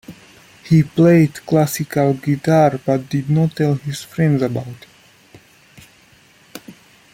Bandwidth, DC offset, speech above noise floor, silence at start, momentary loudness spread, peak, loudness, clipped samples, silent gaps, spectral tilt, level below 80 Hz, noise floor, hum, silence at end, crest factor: 16.5 kHz; under 0.1%; 35 dB; 0.1 s; 18 LU; -2 dBFS; -17 LUFS; under 0.1%; none; -7.5 dB/octave; -54 dBFS; -50 dBFS; none; 0.4 s; 16 dB